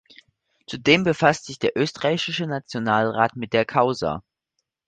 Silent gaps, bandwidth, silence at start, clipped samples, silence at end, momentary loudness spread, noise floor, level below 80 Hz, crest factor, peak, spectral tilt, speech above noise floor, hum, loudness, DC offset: none; 9.4 kHz; 0.7 s; under 0.1%; 0.65 s; 9 LU; -78 dBFS; -56 dBFS; 22 dB; -2 dBFS; -5 dB/octave; 56 dB; none; -22 LUFS; under 0.1%